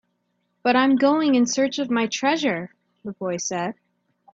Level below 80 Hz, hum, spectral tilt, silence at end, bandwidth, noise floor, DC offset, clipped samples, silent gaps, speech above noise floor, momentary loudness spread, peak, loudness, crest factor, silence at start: -68 dBFS; none; -3.5 dB/octave; 0.6 s; 7.8 kHz; -72 dBFS; under 0.1%; under 0.1%; none; 51 dB; 13 LU; -4 dBFS; -22 LUFS; 18 dB; 0.65 s